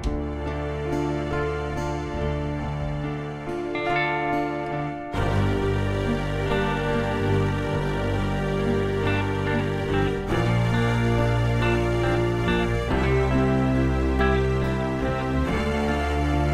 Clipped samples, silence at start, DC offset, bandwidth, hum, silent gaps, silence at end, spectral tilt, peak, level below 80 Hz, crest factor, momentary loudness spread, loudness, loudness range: under 0.1%; 0 s; under 0.1%; 13.5 kHz; none; none; 0 s; -7 dB/octave; -10 dBFS; -32 dBFS; 14 dB; 7 LU; -24 LUFS; 5 LU